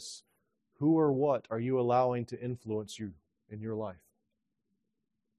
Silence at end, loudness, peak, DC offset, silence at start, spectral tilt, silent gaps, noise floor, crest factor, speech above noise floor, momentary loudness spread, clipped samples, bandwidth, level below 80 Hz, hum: 1.45 s; -32 LUFS; -16 dBFS; under 0.1%; 0 s; -7 dB/octave; none; -85 dBFS; 18 dB; 54 dB; 17 LU; under 0.1%; 12 kHz; -72 dBFS; none